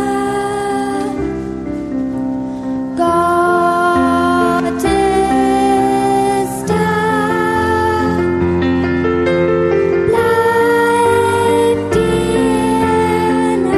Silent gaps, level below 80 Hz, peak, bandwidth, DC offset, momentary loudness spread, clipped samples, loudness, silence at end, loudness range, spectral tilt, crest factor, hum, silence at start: none; -36 dBFS; -2 dBFS; 13 kHz; under 0.1%; 8 LU; under 0.1%; -14 LUFS; 0 s; 3 LU; -6 dB/octave; 12 dB; none; 0 s